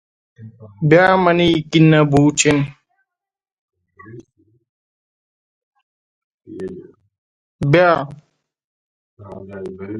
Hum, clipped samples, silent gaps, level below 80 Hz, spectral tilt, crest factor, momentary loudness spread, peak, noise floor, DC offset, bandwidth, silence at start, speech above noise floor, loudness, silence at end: none; under 0.1%; 3.52-3.68 s, 4.69-5.72 s, 5.83-6.38 s, 7.18-7.59 s, 8.64-9.17 s; -50 dBFS; -5.5 dB/octave; 20 dB; 20 LU; 0 dBFS; -86 dBFS; under 0.1%; 10 kHz; 0.4 s; 71 dB; -14 LUFS; 0 s